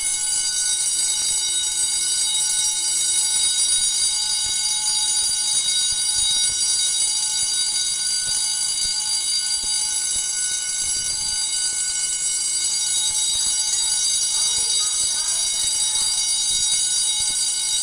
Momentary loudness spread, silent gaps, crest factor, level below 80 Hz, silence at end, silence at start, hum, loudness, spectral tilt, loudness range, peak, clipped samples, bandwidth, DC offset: 3 LU; none; 14 dB; -52 dBFS; 0 s; 0 s; none; -18 LUFS; 3 dB/octave; 2 LU; -8 dBFS; under 0.1%; 11.5 kHz; under 0.1%